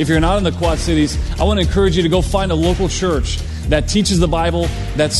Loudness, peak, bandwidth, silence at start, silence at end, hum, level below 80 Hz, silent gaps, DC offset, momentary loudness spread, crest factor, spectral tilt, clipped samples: -16 LUFS; 0 dBFS; 12.5 kHz; 0 s; 0 s; none; -22 dBFS; none; under 0.1%; 5 LU; 14 dB; -5 dB/octave; under 0.1%